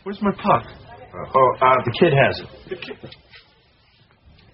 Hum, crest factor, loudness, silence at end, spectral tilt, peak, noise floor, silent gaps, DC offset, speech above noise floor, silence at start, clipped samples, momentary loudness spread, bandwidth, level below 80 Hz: none; 20 dB; -18 LUFS; 1.45 s; -4.5 dB/octave; -2 dBFS; -57 dBFS; none; under 0.1%; 37 dB; 0.05 s; under 0.1%; 23 LU; 5.8 kHz; -52 dBFS